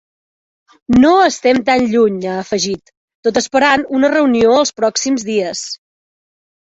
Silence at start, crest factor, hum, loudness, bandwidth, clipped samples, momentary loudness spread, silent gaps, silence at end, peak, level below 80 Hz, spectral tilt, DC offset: 0.9 s; 14 dB; none; -14 LUFS; 8 kHz; under 0.1%; 10 LU; 2.97-3.08 s, 3.15-3.23 s; 0.9 s; 0 dBFS; -46 dBFS; -3.5 dB/octave; under 0.1%